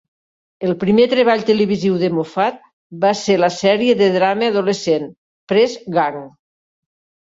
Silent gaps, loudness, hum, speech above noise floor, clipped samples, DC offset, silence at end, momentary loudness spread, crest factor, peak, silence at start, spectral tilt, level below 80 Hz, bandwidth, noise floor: 2.73-2.90 s, 5.18-5.47 s; -16 LUFS; none; over 74 dB; under 0.1%; under 0.1%; 1 s; 7 LU; 16 dB; -2 dBFS; 0.6 s; -5.5 dB/octave; -60 dBFS; 7.8 kHz; under -90 dBFS